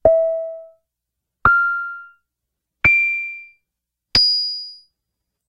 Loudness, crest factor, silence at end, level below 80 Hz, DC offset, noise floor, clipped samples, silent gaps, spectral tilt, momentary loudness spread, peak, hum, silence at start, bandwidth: -17 LUFS; 20 dB; 0.75 s; -44 dBFS; under 0.1%; -81 dBFS; under 0.1%; none; -3 dB/octave; 21 LU; 0 dBFS; none; 0.05 s; 15 kHz